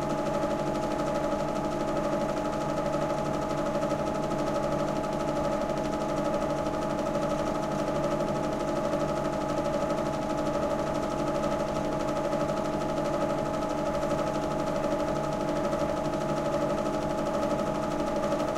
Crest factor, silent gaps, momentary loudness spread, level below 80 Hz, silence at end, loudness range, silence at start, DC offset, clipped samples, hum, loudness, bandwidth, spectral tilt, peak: 12 dB; none; 1 LU; -46 dBFS; 0 s; 0 LU; 0 s; under 0.1%; under 0.1%; none; -29 LUFS; 15.5 kHz; -6 dB/octave; -16 dBFS